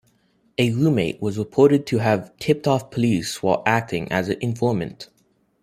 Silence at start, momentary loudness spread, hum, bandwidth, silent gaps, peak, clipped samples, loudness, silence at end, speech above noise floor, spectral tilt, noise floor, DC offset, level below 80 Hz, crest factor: 0.6 s; 9 LU; none; 15.5 kHz; none; -2 dBFS; under 0.1%; -21 LUFS; 0.6 s; 43 dB; -6.5 dB/octave; -64 dBFS; under 0.1%; -56 dBFS; 20 dB